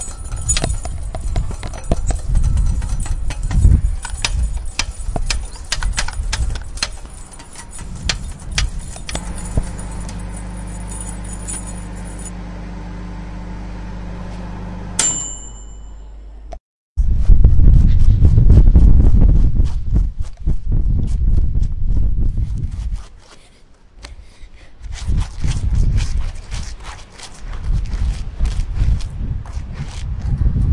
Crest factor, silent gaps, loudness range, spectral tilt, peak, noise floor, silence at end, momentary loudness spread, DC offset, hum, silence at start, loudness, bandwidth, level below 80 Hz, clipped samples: 16 dB; 16.60-16.95 s; 13 LU; -4.5 dB/octave; 0 dBFS; -45 dBFS; 0 s; 19 LU; under 0.1%; none; 0 s; -20 LUFS; 11.5 kHz; -18 dBFS; under 0.1%